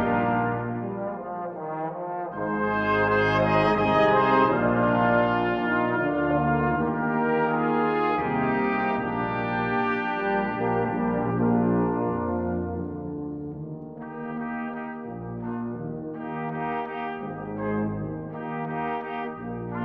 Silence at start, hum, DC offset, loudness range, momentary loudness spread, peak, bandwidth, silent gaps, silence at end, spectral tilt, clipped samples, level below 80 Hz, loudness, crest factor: 0 s; none; under 0.1%; 11 LU; 12 LU; -8 dBFS; 6.2 kHz; none; 0 s; -8.5 dB/octave; under 0.1%; -50 dBFS; -26 LUFS; 18 dB